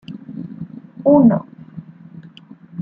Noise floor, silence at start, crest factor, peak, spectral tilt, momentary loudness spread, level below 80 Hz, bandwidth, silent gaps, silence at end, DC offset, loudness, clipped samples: -42 dBFS; 0.1 s; 18 dB; -2 dBFS; -11.5 dB/octave; 25 LU; -58 dBFS; 4.9 kHz; none; 0 s; under 0.1%; -14 LUFS; under 0.1%